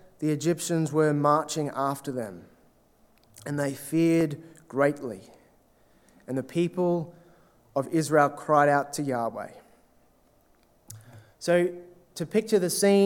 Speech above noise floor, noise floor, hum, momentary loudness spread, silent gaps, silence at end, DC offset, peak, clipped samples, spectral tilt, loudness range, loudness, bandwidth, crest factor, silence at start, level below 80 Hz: 37 dB; -63 dBFS; none; 18 LU; none; 0 s; under 0.1%; -6 dBFS; under 0.1%; -5.5 dB/octave; 5 LU; -26 LUFS; 18 kHz; 20 dB; 0.2 s; -70 dBFS